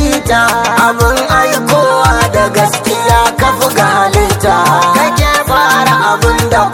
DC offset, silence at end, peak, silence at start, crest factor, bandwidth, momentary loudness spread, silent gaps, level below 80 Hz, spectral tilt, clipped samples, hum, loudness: under 0.1%; 0 s; 0 dBFS; 0 s; 10 dB; 19.5 kHz; 2 LU; none; -22 dBFS; -4 dB/octave; 0.3%; none; -9 LUFS